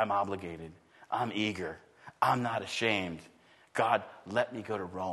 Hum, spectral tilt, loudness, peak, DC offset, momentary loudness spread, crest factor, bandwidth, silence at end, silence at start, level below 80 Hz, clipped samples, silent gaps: none; -5 dB/octave; -33 LUFS; -12 dBFS; under 0.1%; 13 LU; 22 dB; 12.5 kHz; 0 s; 0 s; -68 dBFS; under 0.1%; none